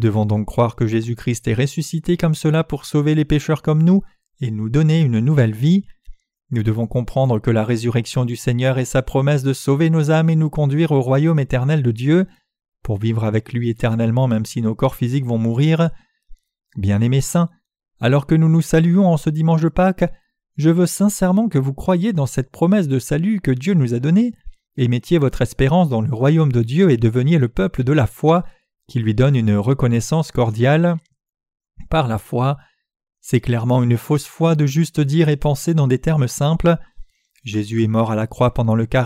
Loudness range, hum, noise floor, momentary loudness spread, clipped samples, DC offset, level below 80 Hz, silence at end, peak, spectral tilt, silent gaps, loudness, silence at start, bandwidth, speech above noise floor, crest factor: 3 LU; none; -42 dBFS; 7 LU; under 0.1%; under 0.1%; -38 dBFS; 0 s; -4 dBFS; -7 dB/octave; 32.96-33.00 s; -18 LUFS; 0 s; 15 kHz; 26 dB; 14 dB